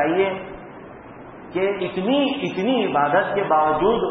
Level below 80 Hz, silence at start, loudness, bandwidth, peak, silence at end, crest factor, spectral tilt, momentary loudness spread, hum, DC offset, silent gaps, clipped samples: -52 dBFS; 0 s; -21 LUFS; 6.4 kHz; -6 dBFS; 0 s; 16 dB; -7 dB/octave; 21 LU; none; under 0.1%; none; under 0.1%